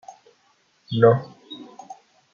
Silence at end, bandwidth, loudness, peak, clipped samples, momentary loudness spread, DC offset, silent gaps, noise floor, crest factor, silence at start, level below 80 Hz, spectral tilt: 0.4 s; 7 kHz; -20 LUFS; -2 dBFS; under 0.1%; 25 LU; under 0.1%; none; -63 dBFS; 22 dB; 0.9 s; -66 dBFS; -8 dB/octave